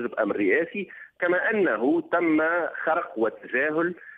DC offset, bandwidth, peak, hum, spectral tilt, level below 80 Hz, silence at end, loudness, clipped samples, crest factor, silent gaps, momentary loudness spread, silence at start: under 0.1%; 4.5 kHz; -10 dBFS; none; -8.5 dB/octave; -72 dBFS; 0 s; -25 LUFS; under 0.1%; 14 dB; none; 6 LU; 0 s